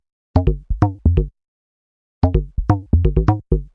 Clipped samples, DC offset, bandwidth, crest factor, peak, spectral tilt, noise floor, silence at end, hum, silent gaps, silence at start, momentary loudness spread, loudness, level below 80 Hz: under 0.1%; under 0.1%; 6 kHz; 16 dB; -2 dBFS; -10.5 dB/octave; under -90 dBFS; 0.1 s; none; 1.48-2.21 s; 0.35 s; 5 LU; -19 LUFS; -24 dBFS